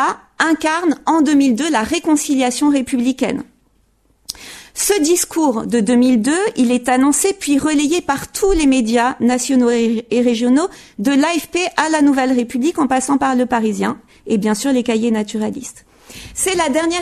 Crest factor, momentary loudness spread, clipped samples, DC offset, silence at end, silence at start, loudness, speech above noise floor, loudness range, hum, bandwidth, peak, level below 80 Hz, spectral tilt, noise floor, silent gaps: 16 dB; 8 LU; under 0.1%; under 0.1%; 0 s; 0 s; -16 LUFS; 42 dB; 4 LU; none; 13.5 kHz; 0 dBFS; -40 dBFS; -3.5 dB/octave; -58 dBFS; none